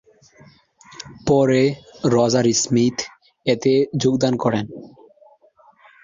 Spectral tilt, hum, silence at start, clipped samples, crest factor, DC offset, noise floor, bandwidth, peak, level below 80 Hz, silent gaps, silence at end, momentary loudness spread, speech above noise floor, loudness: -5 dB/octave; none; 1 s; under 0.1%; 18 dB; under 0.1%; -54 dBFS; 7.6 kHz; -4 dBFS; -54 dBFS; none; 1.2 s; 18 LU; 36 dB; -19 LUFS